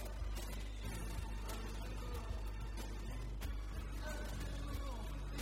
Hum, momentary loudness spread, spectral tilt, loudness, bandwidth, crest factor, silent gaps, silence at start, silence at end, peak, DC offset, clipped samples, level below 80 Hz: none; 2 LU; -5 dB/octave; -46 LUFS; 16 kHz; 14 dB; none; 0 s; 0 s; -30 dBFS; under 0.1%; under 0.1%; -44 dBFS